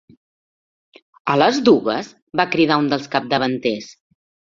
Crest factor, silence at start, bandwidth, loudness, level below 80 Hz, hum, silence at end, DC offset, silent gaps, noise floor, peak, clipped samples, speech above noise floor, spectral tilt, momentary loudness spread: 18 dB; 1.25 s; 7.6 kHz; -18 LUFS; -60 dBFS; none; 0.6 s; under 0.1%; 2.22-2.27 s; under -90 dBFS; -2 dBFS; under 0.1%; over 72 dB; -5.5 dB/octave; 12 LU